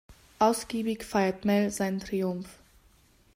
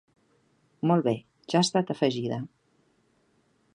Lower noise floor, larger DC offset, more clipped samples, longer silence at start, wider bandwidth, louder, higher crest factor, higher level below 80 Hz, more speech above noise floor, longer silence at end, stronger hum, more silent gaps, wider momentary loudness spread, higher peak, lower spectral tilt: second, -61 dBFS vs -68 dBFS; neither; neither; second, 0.1 s vs 0.85 s; first, 16 kHz vs 11 kHz; about the same, -29 LUFS vs -27 LUFS; about the same, 18 dB vs 20 dB; first, -58 dBFS vs -72 dBFS; second, 34 dB vs 42 dB; second, 0.85 s vs 1.3 s; neither; neither; second, 7 LU vs 10 LU; about the same, -10 dBFS vs -10 dBFS; about the same, -5.5 dB/octave vs -5.5 dB/octave